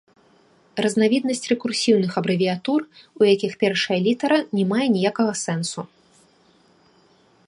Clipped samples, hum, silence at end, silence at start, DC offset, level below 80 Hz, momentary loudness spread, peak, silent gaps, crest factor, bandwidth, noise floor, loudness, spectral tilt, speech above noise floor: under 0.1%; none; 1.65 s; 0.75 s; under 0.1%; -70 dBFS; 7 LU; -4 dBFS; none; 18 dB; 11.5 kHz; -57 dBFS; -21 LUFS; -5 dB/octave; 37 dB